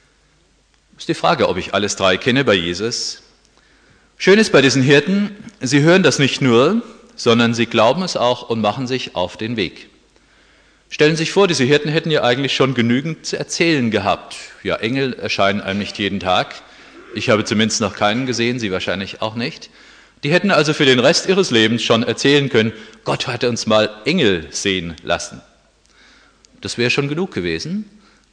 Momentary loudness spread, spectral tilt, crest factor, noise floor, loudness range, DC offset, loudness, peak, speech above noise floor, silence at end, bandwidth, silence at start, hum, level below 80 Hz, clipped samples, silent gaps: 12 LU; -4.5 dB/octave; 16 dB; -57 dBFS; 6 LU; under 0.1%; -16 LUFS; 0 dBFS; 40 dB; 0.5 s; 10.5 kHz; 1 s; none; -52 dBFS; under 0.1%; none